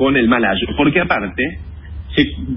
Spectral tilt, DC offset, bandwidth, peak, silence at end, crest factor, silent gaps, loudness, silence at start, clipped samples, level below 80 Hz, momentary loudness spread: -11 dB/octave; under 0.1%; 5.8 kHz; 0 dBFS; 0 s; 16 dB; none; -16 LUFS; 0 s; under 0.1%; -32 dBFS; 18 LU